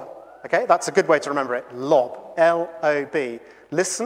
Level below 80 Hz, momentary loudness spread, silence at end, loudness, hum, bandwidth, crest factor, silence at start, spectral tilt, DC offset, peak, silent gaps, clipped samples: -72 dBFS; 11 LU; 0 s; -21 LUFS; none; 15.5 kHz; 20 dB; 0 s; -4 dB/octave; under 0.1%; -2 dBFS; none; under 0.1%